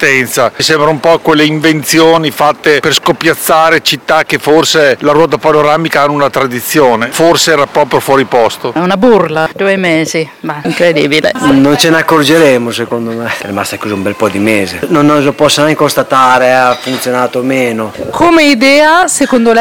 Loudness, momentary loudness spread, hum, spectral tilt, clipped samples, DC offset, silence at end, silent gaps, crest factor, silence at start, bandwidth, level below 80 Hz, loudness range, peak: -8 LUFS; 8 LU; none; -4 dB/octave; 5%; under 0.1%; 0 s; none; 8 dB; 0 s; over 20 kHz; -44 dBFS; 2 LU; 0 dBFS